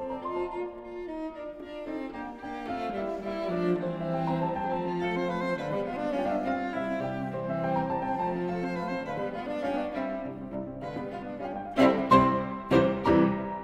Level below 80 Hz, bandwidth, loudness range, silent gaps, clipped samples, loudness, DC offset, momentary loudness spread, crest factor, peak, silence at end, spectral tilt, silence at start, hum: -54 dBFS; 12.5 kHz; 7 LU; none; under 0.1%; -30 LUFS; under 0.1%; 13 LU; 20 dB; -8 dBFS; 0 s; -7.5 dB/octave; 0 s; none